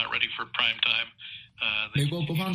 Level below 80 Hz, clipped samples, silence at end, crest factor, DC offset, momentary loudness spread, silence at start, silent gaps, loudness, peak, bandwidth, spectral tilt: -60 dBFS; under 0.1%; 0 s; 22 dB; under 0.1%; 12 LU; 0 s; none; -26 LUFS; -8 dBFS; 15.5 kHz; -4.5 dB/octave